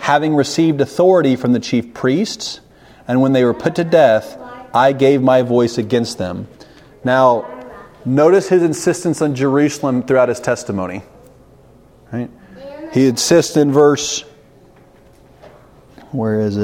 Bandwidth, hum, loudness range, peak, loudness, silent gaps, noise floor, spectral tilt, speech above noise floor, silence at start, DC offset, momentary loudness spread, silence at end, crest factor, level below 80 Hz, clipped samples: 16 kHz; none; 4 LU; 0 dBFS; -15 LUFS; none; -46 dBFS; -5.5 dB/octave; 32 dB; 0 s; under 0.1%; 17 LU; 0 s; 16 dB; -54 dBFS; under 0.1%